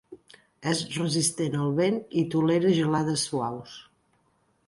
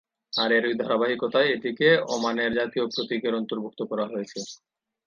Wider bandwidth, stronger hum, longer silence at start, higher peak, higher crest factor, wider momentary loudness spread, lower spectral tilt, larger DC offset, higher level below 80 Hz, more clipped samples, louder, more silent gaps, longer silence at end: first, 11.5 kHz vs 7.4 kHz; neither; second, 0.1 s vs 0.35 s; second, -10 dBFS vs -6 dBFS; about the same, 16 dB vs 18 dB; about the same, 11 LU vs 11 LU; about the same, -5 dB/octave vs -4 dB/octave; neither; about the same, -64 dBFS vs -68 dBFS; neither; about the same, -26 LUFS vs -25 LUFS; neither; first, 0.85 s vs 0.5 s